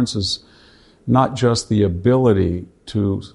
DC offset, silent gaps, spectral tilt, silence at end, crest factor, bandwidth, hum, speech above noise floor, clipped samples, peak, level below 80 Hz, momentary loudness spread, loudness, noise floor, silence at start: under 0.1%; none; -6.5 dB/octave; 0.05 s; 18 dB; 11.5 kHz; none; 32 dB; under 0.1%; -2 dBFS; -42 dBFS; 11 LU; -18 LUFS; -49 dBFS; 0 s